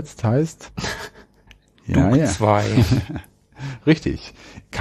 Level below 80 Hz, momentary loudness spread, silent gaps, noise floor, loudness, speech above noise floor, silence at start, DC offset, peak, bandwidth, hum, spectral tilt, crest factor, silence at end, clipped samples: -38 dBFS; 18 LU; none; -52 dBFS; -20 LUFS; 33 dB; 0 s; under 0.1%; -2 dBFS; 13.5 kHz; none; -6.5 dB/octave; 18 dB; 0 s; under 0.1%